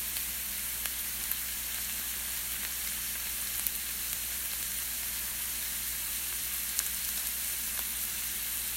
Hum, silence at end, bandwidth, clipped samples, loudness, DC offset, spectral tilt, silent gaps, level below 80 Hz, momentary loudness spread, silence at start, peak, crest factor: none; 0 s; 16 kHz; under 0.1%; -32 LUFS; under 0.1%; 0.5 dB/octave; none; -52 dBFS; 2 LU; 0 s; -4 dBFS; 30 dB